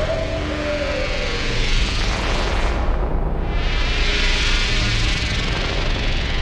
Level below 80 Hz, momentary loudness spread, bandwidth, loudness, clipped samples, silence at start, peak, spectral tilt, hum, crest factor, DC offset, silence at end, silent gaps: -22 dBFS; 5 LU; 10 kHz; -21 LUFS; under 0.1%; 0 s; -6 dBFS; -4 dB/octave; none; 14 dB; under 0.1%; 0 s; none